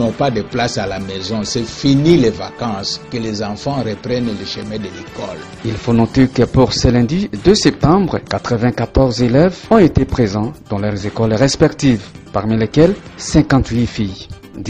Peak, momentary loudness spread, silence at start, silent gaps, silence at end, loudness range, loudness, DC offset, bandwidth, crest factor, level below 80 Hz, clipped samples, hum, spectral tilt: 0 dBFS; 12 LU; 0 s; none; 0 s; 5 LU; -15 LUFS; under 0.1%; 9.6 kHz; 14 dB; -32 dBFS; under 0.1%; none; -6 dB/octave